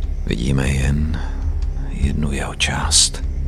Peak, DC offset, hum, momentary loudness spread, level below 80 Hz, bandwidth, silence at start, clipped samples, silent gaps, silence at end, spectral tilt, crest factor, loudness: 0 dBFS; under 0.1%; none; 11 LU; -22 dBFS; 13.5 kHz; 0 s; under 0.1%; none; 0 s; -3.5 dB/octave; 18 dB; -19 LUFS